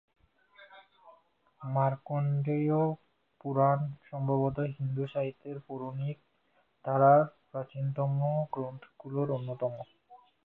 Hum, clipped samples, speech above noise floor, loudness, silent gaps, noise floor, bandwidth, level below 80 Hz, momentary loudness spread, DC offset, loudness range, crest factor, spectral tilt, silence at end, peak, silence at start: none; under 0.1%; 42 dB; -31 LUFS; none; -72 dBFS; 4 kHz; -68 dBFS; 17 LU; under 0.1%; 3 LU; 20 dB; -12 dB/octave; 0.3 s; -12 dBFS; 0.6 s